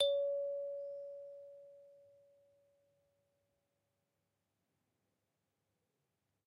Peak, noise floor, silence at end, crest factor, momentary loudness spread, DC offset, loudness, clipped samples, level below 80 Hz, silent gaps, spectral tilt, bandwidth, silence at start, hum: -22 dBFS; -86 dBFS; 4.45 s; 24 dB; 23 LU; under 0.1%; -41 LUFS; under 0.1%; -90 dBFS; none; 0 dB/octave; 8 kHz; 0 s; none